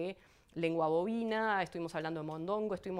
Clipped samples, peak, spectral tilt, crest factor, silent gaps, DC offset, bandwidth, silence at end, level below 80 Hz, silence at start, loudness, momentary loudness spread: under 0.1%; -20 dBFS; -6.5 dB/octave; 16 dB; none; under 0.1%; 12.5 kHz; 0 s; -70 dBFS; 0 s; -36 LUFS; 9 LU